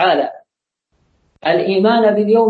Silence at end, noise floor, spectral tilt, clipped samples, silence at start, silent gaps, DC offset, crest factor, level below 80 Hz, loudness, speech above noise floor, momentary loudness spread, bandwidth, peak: 0 s; -75 dBFS; -8 dB/octave; under 0.1%; 0 s; none; under 0.1%; 14 dB; -64 dBFS; -15 LUFS; 62 dB; 10 LU; 4.9 kHz; -2 dBFS